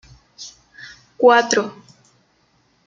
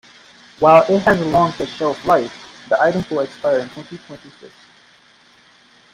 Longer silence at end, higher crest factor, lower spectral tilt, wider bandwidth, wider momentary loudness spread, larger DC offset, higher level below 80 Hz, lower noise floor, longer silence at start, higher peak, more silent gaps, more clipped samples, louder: second, 1.15 s vs 1.45 s; about the same, 20 dB vs 18 dB; second, -2.5 dB/octave vs -6 dB/octave; second, 7.6 kHz vs 12 kHz; first, 26 LU vs 23 LU; neither; second, -62 dBFS vs -52 dBFS; first, -61 dBFS vs -51 dBFS; second, 0.4 s vs 0.6 s; about the same, -2 dBFS vs 0 dBFS; neither; neither; about the same, -15 LUFS vs -16 LUFS